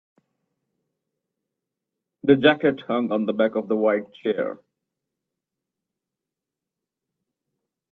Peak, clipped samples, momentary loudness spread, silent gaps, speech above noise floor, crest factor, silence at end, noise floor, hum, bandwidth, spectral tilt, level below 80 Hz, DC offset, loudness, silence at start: -4 dBFS; under 0.1%; 10 LU; none; 66 dB; 24 dB; 3.35 s; -87 dBFS; none; 4.4 kHz; -8.5 dB/octave; -68 dBFS; under 0.1%; -22 LUFS; 2.25 s